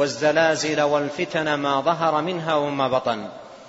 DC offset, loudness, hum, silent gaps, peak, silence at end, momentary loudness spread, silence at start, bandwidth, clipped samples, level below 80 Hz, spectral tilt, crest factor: under 0.1%; -22 LUFS; none; none; -4 dBFS; 0 s; 6 LU; 0 s; 8 kHz; under 0.1%; -62 dBFS; -4.5 dB/octave; 18 dB